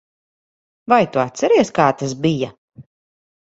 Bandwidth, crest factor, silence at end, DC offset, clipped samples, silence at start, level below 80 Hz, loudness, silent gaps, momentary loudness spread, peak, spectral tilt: 8 kHz; 20 dB; 0.75 s; under 0.1%; under 0.1%; 0.9 s; -58 dBFS; -17 LUFS; 2.58-2.68 s; 9 LU; 0 dBFS; -5.5 dB/octave